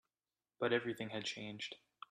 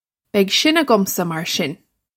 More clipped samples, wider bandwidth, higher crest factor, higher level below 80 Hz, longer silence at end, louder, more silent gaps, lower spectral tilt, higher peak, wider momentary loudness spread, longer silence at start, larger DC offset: neither; second, 13 kHz vs 16.5 kHz; about the same, 20 dB vs 18 dB; second, -82 dBFS vs -66 dBFS; about the same, 0.35 s vs 0.4 s; second, -41 LUFS vs -18 LUFS; neither; about the same, -4 dB/octave vs -3.5 dB/octave; second, -22 dBFS vs 0 dBFS; first, 11 LU vs 8 LU; first, 0.6 s vs 0.35 s; neither